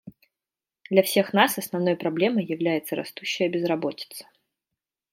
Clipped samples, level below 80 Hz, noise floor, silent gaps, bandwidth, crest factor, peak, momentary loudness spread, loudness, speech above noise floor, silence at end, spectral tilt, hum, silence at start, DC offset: under 0.1%; -74 dBFS; under -90 dBFS; none; 16.5 kHz; 22 dB; -4 dBFS; 11 LU; -24 LUFS; over 66 dB; 0.9 s; -4.5 dB/octave; none; 0.05 s; under 0.1%